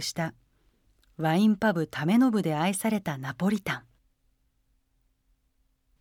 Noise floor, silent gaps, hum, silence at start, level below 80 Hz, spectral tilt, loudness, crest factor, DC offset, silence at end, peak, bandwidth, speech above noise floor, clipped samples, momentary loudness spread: -71 dBFS; none; none; 0 s; -64 dBFS; -5.5 dB/octave; -27 LUFS; 18 dB; under 0.1%; 2.2 s; -12 dBFS; 16.5 kHz; 45 dB; under 0.1%; 11 LU